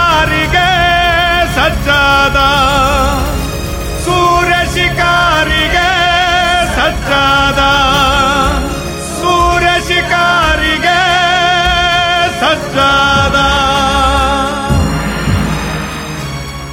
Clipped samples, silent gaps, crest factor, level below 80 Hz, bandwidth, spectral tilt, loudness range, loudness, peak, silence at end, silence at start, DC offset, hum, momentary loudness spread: under 0.1%; none; 10 dB; -22 dBFS; 17 kHz; -4 dB/octave; 1 LU; -10 LUFS; 0 dBFS; 0 s; 0 s; under 0.1%; none; 8 LU